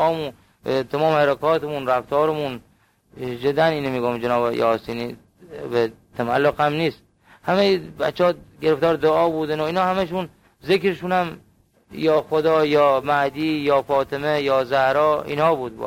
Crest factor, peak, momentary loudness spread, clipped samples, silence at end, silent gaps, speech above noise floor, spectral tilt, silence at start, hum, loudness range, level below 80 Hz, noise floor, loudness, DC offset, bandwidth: 16 dB; -6 dBFS; 11 LU; under 0.1%; 0 s; none; 36 dB; -6.5 dB/octave; 0 s; none; 4 LU; -54 dBFS; -57 dBFS; -21 LUFS; under 0.1%; 16.5 kHz